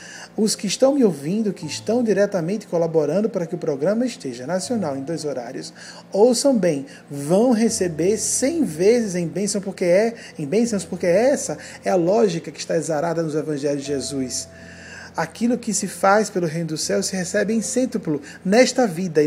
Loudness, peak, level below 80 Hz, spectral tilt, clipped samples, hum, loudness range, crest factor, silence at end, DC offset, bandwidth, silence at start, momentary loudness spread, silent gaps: -21 LUFS; -2 dBFS; -62 dBFS; -4.5 dB/octave; under 0.1%; none; 4 LU; 20 dB; 0 s; under 0.1%; 16 kHz; 0 s; 11 LU; none